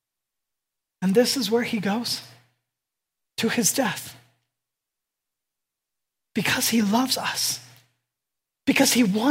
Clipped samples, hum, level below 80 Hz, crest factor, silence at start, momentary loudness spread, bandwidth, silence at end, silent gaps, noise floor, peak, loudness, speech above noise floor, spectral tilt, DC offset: under 0.1%; none; -68 dBFS; 20 dB; 1 s; 12 LU; 16 kHz; 0 s; none; -86 dBFS; -6 dBFS; -23 LUFS; 63 dB; -3 dB/octave; under 0.1%